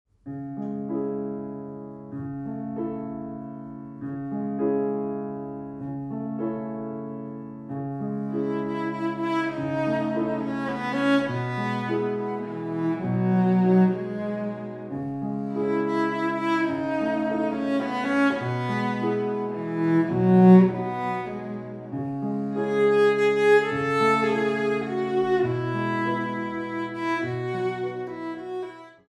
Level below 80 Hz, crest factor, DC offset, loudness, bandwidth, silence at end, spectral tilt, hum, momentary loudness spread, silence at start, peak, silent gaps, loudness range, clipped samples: -62 dBFS; 20 dB; under 0.1%; -25 LUFS; 9.4 kHz; 0.2 s; -8 dB/octave; none; 15 LU; 0.25 s; -4 dBFS; none; 10 LU; under 0.1%